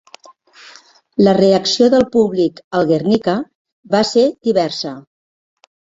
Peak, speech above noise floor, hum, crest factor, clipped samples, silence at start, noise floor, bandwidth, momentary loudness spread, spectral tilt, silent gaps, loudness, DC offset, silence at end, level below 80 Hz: -2 dBFS; 31 dB; none; 14 dB; under 0.1%; 1.2 s; -45 dBFS; 8 kHz; 12 LU; -5.5 dB/octave; 2.64-2.71 s, 3.55-3.65 s, 3.72-3.83 s; -15 LUFS; under 0.1%; 0.95 s; -54 dBFS